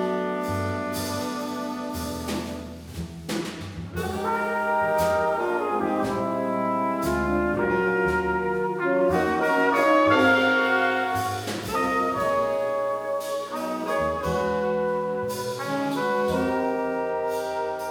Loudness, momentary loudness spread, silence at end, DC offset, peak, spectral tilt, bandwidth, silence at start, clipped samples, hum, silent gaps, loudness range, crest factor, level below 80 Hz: -25 LUFS; 10 LU; 0 s; under 0.1%; -8 dBFS; -5.5 dB/octave; over 20 kHz; 0 s; under 0.1%; none; none; 8 LU; 16 dB; -48 dBFS